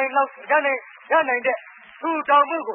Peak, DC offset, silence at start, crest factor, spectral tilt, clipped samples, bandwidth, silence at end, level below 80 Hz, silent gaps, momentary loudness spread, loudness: -6 dBFS; under 0.1%; 0 s; 16 dB; -7 dB/octave; under 0.1%; 3.6 kHz; 0 s; -80 dBFS; none; 10 LU; -21 LUFS